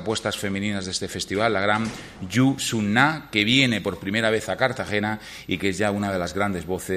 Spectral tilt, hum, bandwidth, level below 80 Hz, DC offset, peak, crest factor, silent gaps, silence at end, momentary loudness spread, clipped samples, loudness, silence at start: -4.5 dB/octave; none; 15.5 kHz; -52 dBFS; under 0.1%; -4 dBFS; 20 dB; none; 0 s; 8 LU; under 0.1%; -23 LUFS; 0 s